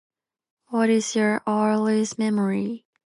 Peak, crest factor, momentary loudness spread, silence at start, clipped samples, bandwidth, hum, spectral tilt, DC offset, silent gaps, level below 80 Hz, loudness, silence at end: -10 dBFS; 14 dB; 6 LU; 0.7 s; under 0.1%; 11.5 kHz; none; -5 dB/octave; under 0.1%; none; -72 dBFS; -23 LUFS; 0.25 s